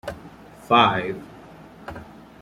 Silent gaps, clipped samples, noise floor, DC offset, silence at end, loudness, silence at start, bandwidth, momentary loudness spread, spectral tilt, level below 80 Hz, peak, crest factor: none; under 0.1%; -44 dBFS; under 0.1%; 0.3 s; -19 LUFS; 0.05 s; 16 kHz; 24 LU; -5.5 dB/octave; -54 dBFS; -4 dBFS; 22 dB